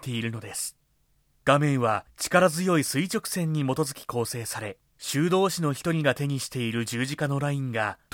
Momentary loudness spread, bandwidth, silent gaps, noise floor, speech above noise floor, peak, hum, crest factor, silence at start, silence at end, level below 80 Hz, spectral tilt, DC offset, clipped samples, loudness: 10 LU; 18 kHz; none; -67 dBFS; 41 dB; -6 dBFS; none; 20 dB; 0 s; 0.2 s; -62 dBFS; -5 dB/octave; under 0.1%; under 0.1%; -26 LUFS